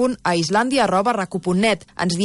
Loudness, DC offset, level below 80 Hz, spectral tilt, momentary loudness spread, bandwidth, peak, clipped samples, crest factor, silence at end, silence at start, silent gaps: -19 LUFS; under 0.1%; -52 dBFS; -5 dB/octave; 5 LU; 11.5 kHz; -8 dBFS; under 0.1%; 12 dB; 0 s; 0 s; none